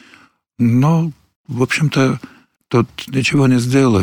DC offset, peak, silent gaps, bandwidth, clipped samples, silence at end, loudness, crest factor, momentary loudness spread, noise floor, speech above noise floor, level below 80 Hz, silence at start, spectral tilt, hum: under 0.1%; -2 dBFS; 1.36-1.44 s; 17.5 kHz; under 0.1%; 0 s; -16 LUFS; 14 dB; 8 LU; -49 dBFS; 35 dB; -52 dBFS; 0.6 s; -6.5 dB/octave; none